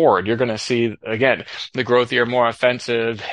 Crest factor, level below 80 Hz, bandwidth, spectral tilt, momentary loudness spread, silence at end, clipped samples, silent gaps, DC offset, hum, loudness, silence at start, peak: 16 dB; -60 dBFS; 11 kHz; -5 dB/octave; 6 LU; 0 s; under 0.1%; none; under 0.1%; none; -19 LUFS; 0 s; -2 dBFS